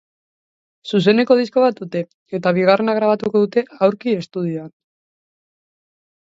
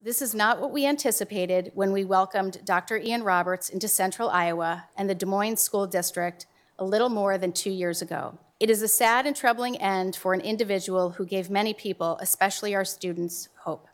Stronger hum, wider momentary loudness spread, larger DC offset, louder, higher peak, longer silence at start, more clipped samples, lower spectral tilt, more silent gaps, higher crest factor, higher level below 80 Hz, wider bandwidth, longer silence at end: neither; first, 11 LU vs 7 LU; neither; first, -18 LUFS vs -26 LUFS; first, -2 dBFS vs -6 dBFS; first, 0.85 s vs 0.05 s; neither; first, -7.5 dB/octave vs -3 dB/octave; first, 2.14-2.26 s vs none; about the same, 18 dB vs 20 dB; first, -66 dBFS vs -74 dBFS; second, 7.8 kHz vs over 20 kHz; first, 1.55 s vs 0.15 s